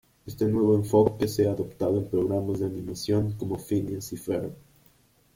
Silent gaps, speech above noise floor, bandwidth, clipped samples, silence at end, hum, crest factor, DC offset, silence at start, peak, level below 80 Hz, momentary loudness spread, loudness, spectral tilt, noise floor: none; 36 dB; 16.5 kHz; under 0.1%; 0.75 s; none; 18 dB; under 0.1%; 0.25 s; -8 dBFS; -54 dBFS; 11 LU; -27 LUFS; -7.5 dB/octave; -62 dBFS